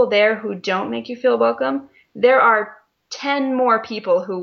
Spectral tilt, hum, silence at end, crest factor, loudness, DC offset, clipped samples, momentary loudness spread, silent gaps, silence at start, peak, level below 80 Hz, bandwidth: -5 dB/octave; none; 0 s; 16 dB; -18 LUFS; under 0.1%; under 0.1%; 13 LU; none; 0 s; -2 dBFS; -68 dBFS; 7 kHz